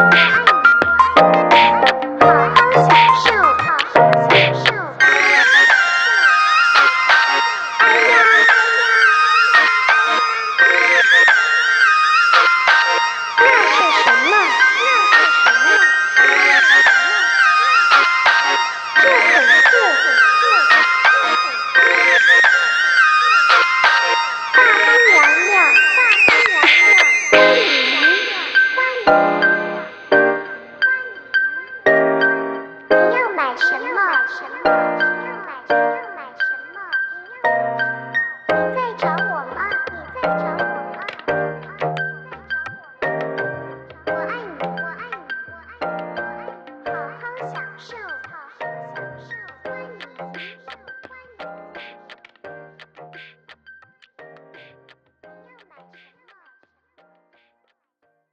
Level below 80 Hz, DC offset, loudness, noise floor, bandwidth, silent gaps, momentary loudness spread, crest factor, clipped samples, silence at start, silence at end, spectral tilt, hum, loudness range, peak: -58 dBFS; under 0.1%; -12 LUFS; -69 dBFS; 9.6 kHz; none; 19 LU; 16 dB; under 0.1%; 0 s; 5.1 s; -2.5 dB/octave; none; 17 LU; 0 dBFS